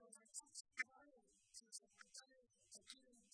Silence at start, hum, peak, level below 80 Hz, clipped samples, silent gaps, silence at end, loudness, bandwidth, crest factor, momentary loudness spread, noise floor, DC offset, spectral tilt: 0 s; none; -30 dBFS; under -90 dBFS; under 0.1%; none; 0.05 s; -56 LUFS; 11 kHz; 28 dB; 13 LU; -75 dBFS; under 0.1%; 1.5 dB/octave